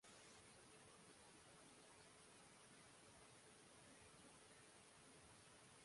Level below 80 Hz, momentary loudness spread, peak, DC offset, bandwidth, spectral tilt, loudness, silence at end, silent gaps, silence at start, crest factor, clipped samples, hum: -86 dBFS; 1 LU; -54 dBFS; under 0.1%; 11.5 kHz; -2.5 dB/octave; -66 LUFS; 0 s; none; 0 s; 14 dB; under 0.1%; none